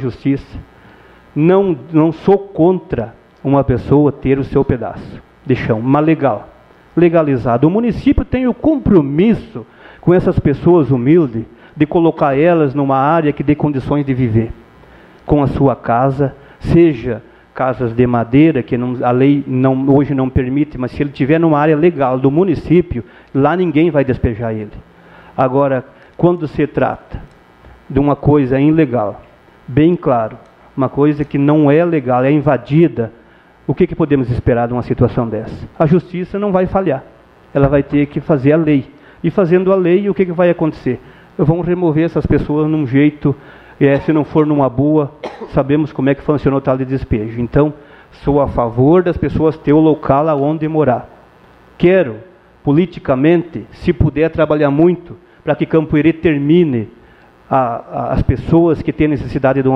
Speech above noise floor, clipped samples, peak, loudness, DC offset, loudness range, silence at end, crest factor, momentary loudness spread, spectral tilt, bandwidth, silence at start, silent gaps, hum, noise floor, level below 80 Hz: 31 dB; under 0.1%; 0 dBFS; -14 LUFS; under 0.1%; 3 LU; 0 s; 14 dB; 10 LU; -10.5 dB/octave; 5.8 kHz; 0 s; none; none; -44 dBFS; -34 dBFS